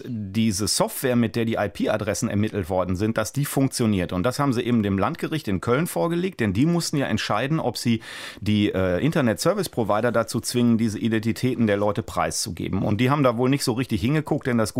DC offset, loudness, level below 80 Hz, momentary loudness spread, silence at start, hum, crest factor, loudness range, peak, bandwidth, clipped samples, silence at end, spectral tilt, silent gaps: under 0.1%; -23 LUFS; -52 dBFS; 4 LU; 0 s; none; 16 dB; 1 LU; -6 dBFS; 16 kHz; under 0.1%; 0 s; -5.5 dB/octave; none